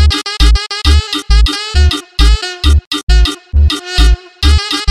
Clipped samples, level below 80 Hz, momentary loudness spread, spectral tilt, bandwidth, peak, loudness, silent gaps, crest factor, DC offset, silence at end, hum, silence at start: under 0.1%; -10 dBFS; 2 LU; -4 dB/octave; 13 kHz; 0 dBFS; -12 LUFS; 2.87-2.91 s, 3.03-3.07 s; 10 dB; 0.5%; 0 s; none; 0 s